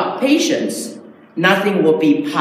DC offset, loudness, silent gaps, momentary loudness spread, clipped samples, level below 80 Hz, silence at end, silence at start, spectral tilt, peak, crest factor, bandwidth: under 0.1%; -15 LUFS; none; 13 LU; under 0.1%; -72 dBFS; 0 s; 0 s; -4.5 dB/octave; 0 dBFS; 16 dB; 15.5 kHz